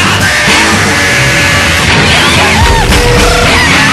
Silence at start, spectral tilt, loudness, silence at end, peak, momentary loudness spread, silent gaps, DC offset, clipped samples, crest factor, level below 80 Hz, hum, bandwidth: 0 s; -3 dB/octave; -5 LUFS; 0 s; 0 dBFS; 2 LU; none; under 0.1%; 0.6%; 6 dB; -16 dBFS; none; 15 kHz